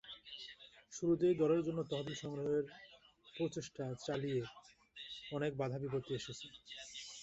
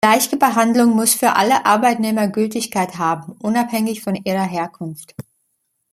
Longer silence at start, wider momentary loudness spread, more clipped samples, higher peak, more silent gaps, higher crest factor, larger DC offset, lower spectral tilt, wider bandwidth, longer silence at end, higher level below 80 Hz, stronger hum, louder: about the same, 0.05 s vs 0.05 s; first, 18 LU vs 11 LU; neither; second, -22 dBFS vs 0 dBFS; neither; about the same, 18 dB vs 16 dB; neither; first, -5.5 dB/octave vs -4 dB/octave; second, 8.2 kHz vs 16 kHz; second, 0 s vs 0.7 s; second, -72 dBFS vs -62 dBFS; neither; second, -40 LUFS vs -17 LUFS